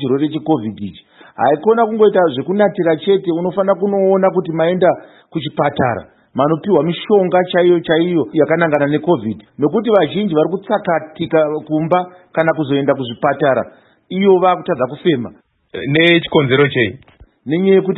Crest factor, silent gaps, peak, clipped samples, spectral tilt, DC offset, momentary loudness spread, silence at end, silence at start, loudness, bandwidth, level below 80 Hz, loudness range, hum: 14 dB; none; 0 dBFS; under 0.1%; -9.5 dB/octave; under 0.1%; 9 LU; 0 s; 0 s; -15 LUFS; 4.1 kHz; -56 dBFS; 2 LU; none